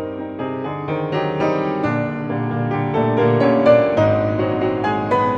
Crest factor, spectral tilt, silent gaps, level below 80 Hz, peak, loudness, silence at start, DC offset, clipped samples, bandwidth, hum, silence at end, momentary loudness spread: 16 dB; -8.5 dB/octave; none; -50 dBFS; -2 dBFS; -19 LUFS; 0 s; under 0.1%; under 0.1%; 7.4 kHz; none; 0 s; 11 LU